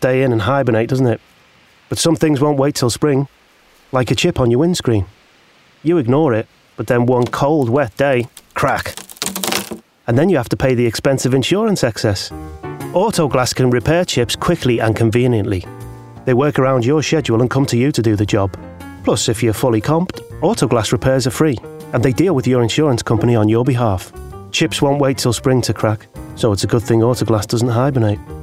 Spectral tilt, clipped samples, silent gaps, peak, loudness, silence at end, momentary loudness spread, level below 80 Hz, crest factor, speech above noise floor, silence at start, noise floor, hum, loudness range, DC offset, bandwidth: -5.5 dB/octave; under 0.1%; none; -2 dBFS; -16 LUFS; 0 s; 10 LU; -42 dBFS; 14 dB; 35 dB; 0 s; -50 dBFS; none; 2 LU; 0.2%; 16 kHz